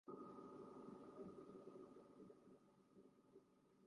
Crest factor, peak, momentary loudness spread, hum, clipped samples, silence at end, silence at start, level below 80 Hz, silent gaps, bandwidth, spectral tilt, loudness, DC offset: 16 dB; -44 dBFS; 7 LU; none; under 0.1%; 0 s; 0.05 s; under -90 dBFS; none; 10.5 kHz; -7.5 dB/octave; -61 LUFS; under 0.1%